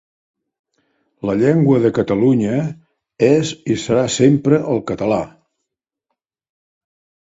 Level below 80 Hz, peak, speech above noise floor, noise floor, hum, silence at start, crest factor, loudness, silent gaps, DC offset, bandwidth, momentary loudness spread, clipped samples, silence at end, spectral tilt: -52 dBFS; 0 dBFS; 64 dB; -80 dBFS; none; 1.25 s; 18 dB; -16 LUFS; none; under 0.1%; 8 kHz; 8 LU; under 0.1%; 1.95 s; -6.5 dB/octave